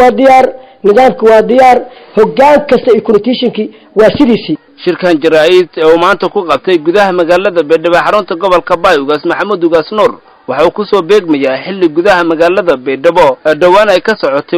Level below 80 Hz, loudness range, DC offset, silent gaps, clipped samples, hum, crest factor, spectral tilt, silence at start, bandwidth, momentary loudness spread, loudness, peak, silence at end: -42 dBFS; 3 LU; under 0.1%; none; 0.5%; none; 8 dB; -5.5 dB/octave; 0 s; 14 kHz; 7 LU; -8 LUFS; 0 dBFS; 0 s